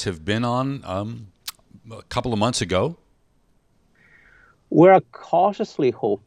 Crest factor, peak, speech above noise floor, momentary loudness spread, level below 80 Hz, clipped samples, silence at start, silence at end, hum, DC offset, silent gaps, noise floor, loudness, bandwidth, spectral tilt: 20 dB; -2 dBFS; 43 dB; 21 LU; -54 dBFS; under 0.1%; 0 s; 0.1 s; none; under 0.1%; none; -63 dBFS; -21 LUFS; 15.5 kHz; -6 dB/octave